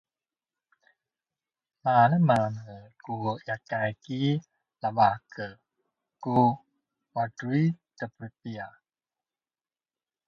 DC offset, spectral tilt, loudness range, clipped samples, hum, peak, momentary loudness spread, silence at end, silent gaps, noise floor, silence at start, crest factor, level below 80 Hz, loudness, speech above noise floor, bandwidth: under 0.1%; -8 dB/octave; 6 LU; under 0.1%; none; -8 dBFS; 18 LU; 1.6 s; none; under -90 dBFS; 1.85 s; 22 dB; -66 dBFS; -27 LUFS; over 63 dB; 10 kHz